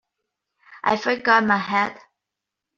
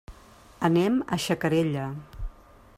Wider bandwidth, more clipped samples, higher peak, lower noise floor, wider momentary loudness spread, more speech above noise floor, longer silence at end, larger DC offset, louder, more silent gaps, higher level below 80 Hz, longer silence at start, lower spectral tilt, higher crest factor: second, 7.4 kHz vs 15.5 kHz; neither; first, -2 dBFS vs -10 dBFS; first, -85 dBFS vs -52 dBFS; second, 9 LU vs 19 LU; first, 64 dB vs 27 dB; first, 0.8 s vs 0.45 s; neither; first, -20 LUFS vs -26 LUFS; neither; second, -64 dBFS vs -44 dBFS; first, 0.7 s vs 0.1 s; second, -2 dB/octave vs -6 dB/octave; about the same, 20 dB vs 18 dB